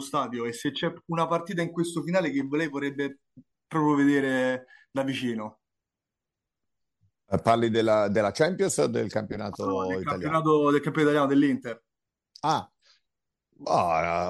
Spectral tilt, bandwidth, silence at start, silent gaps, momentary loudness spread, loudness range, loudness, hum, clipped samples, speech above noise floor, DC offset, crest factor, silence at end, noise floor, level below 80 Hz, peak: -5.5 dB/octave; 12.5 kHz; 0 s; none; 10 LU; 4 LU; -26 LUFS; none; under 0.1%; 62 dB; under 0.1%; 18 dB; 0 s; -88 dBFS; -62 dBFS; -8 dBFS